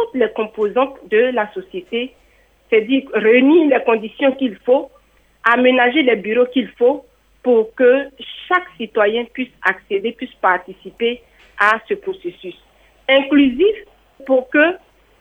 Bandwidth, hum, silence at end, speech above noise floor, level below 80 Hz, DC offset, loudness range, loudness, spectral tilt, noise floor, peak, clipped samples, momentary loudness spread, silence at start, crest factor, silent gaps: 6 kHz; none; 0.45 s; 38 dB; -56 dBFS; under 0.1%; 5 LU; -16 LUFS; -6 dB/octave; -54 dBFS; 0 dBFS; under 0.1%; 15 LU; 0 s; 16 dB; none